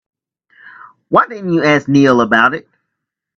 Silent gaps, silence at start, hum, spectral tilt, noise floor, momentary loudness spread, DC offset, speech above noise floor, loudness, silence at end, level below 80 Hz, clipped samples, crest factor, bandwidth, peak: none; 0.65 s; none; -6 dB/octave; -77 dBFS; 5 LU; under 0.1%; 65 dB; -12 LUFS; 0.75 s; -56 dBFS; under 0.1%; 14 dB; 7.4 kHz; 0 dBFS